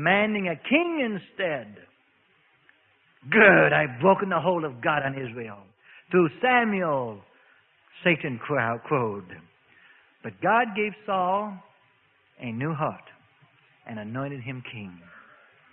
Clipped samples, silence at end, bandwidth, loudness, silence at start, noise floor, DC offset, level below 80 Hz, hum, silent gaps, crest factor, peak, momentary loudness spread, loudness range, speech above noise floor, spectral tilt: under 0.1%; 0.55 s; 4 kHz; -24 LUFS; 0 s; -64 dBFS; under 0.1%; -66 dBFS; none; none; 22 dB; -4 dBFS; 18 LU; 13 LU; 40 dB; -10.5 dB/octave